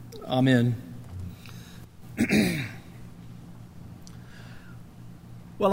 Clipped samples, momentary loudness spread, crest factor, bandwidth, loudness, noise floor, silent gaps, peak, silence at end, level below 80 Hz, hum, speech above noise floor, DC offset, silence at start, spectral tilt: under 0.1%; 24 LU; 22 dB; 16 kHz; -26 LUFS; -45 dBFS; none; -8 dBFS; 0 s; -54 dBFS; none; 22 dB; under 0.1%; 0 s; -6 dB/octave